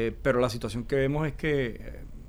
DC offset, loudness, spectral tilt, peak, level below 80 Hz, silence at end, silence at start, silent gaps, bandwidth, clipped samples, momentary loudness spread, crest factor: under 0.1%; -28 LUFS; -6.5 dB/octave; -12 dBFS; -42 dBFS; 0 s; 0 s; none; over 20 kHz; under 0.1%; 10 LU; 16 dB